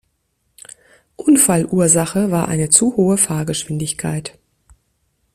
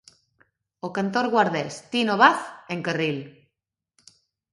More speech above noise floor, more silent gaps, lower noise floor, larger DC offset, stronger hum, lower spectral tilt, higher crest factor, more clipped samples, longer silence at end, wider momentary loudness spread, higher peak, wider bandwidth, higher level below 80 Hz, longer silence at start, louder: second, 51 dB vs 61 dB; neither; second, -67 dBFS vs -84 dBFS; neither; neither; about the same, -4.5 dB/octave vs -5 dB/octave; second, 18 dB vs 24 dB; neither; second, 1.05 s vs 1.2 s; second, 11 LU vs 16 LU; about the same, 0 dBFS vs -2 dBFS; first, 15.5 kHz vs 11.5 kHz; first, -52 dBFS vs -72 dBFS; first, 1.2 s vs 0.85 s; first, -15 LUFS vs -23 LUFS